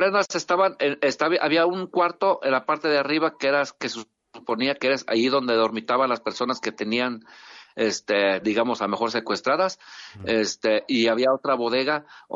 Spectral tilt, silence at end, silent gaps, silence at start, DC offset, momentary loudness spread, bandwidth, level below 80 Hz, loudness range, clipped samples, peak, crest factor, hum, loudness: -3.5 dB/octave; 0 s; none; 0 s; under 0.1%; 7 LU; 7.8 kHz; -70 dBFS; 3 LU; under 0.1%; -8 dBFS; 16 dB; none; -23 LUFS